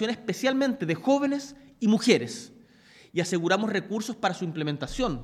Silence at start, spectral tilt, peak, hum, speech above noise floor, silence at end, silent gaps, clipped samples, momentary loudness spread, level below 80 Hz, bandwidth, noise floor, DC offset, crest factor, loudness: 0 s; -5 dB/octave; -6 dBFS; none; 29 dB; 0 s; none; under 0.1%; 10 LU; -52 dBFS; 15 kHz; -55 dBFS; under 0.1%; 22 dB; -27 LUFS